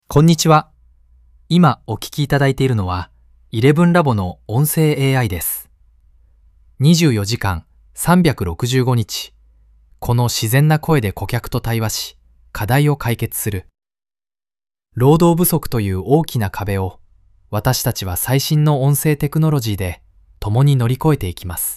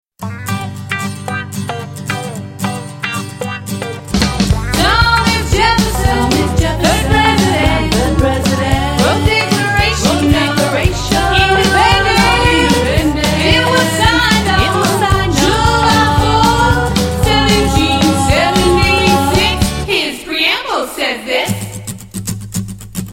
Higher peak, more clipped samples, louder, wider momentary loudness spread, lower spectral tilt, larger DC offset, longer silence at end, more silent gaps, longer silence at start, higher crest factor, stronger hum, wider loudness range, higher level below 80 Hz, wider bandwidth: about the same, 0 dBFS vs 0 dBFS; neither; second, -17 LUFS vs -12 LUFS; about the same, 12 LU vs 12 LU; about the same, -5.5 dB/octave vs -4.5 dB/octave; neither; about the same, 0 s vs 0 s; neither; about the same, 0.1 s vs 0.2 s; about the same, 16 dB vs 12 dB; neither; second, 3 LU vs 7 LU; second, -38 dBFS vs -22 dBFS; about the same, 16 kHz vs 16.5 kHz